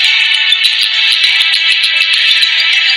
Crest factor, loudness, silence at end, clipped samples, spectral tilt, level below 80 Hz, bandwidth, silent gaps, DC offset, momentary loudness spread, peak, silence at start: 10 dB; -7 LUFS; 0 s; 0.5%; 4.5 dB/octave; -64 dBFS; over 20 kHz; none; under 0.1%; 1 LU; 0 dBFS; 0 s